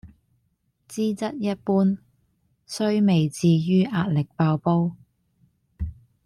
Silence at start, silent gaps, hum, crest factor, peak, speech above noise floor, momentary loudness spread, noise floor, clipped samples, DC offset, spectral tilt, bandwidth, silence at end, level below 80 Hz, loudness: 0.05 s; none; none; 14 dB; -10 dBFS; 49 dB; 15 LU; -70 dBFS; under 0.1%; under 0.1%; -7.5 dB/octave; 12.5 kHz; 0.3 s; -48 dBFS; -23 LUFS